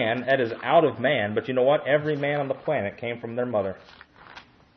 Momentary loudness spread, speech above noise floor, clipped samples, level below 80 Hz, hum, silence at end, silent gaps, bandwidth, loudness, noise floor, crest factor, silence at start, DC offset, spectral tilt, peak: 10 LU; 24 dB; under 0.1%; -68 dBFS; none; 0.35 s; none; 6 kHz; -24 LUFS; -49 dBFS; 18 dB; 0 s; under 0.1%; -8 dB/octave; -6 dBFS